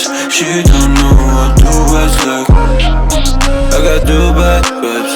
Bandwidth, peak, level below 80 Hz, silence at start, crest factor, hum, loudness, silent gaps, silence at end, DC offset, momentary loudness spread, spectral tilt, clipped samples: 17.5 kHz; 0 dBFS; -10 dBFS; 0 s; 8 dB; none; -10 LUFS; none; 0 s; under 0.1%; 4 LU; -4.5 dB/octave; 0.2%